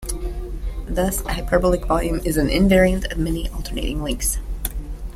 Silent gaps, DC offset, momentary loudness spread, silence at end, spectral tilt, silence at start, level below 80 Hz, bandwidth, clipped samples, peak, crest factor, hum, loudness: none; under 0.1%; 14 LU; 0 s; -5 dB/octave; 0 s; -26 dBFS; 16 kHz; under 0.1%; -2 dBFS; 18 dB; none; -21 LUFS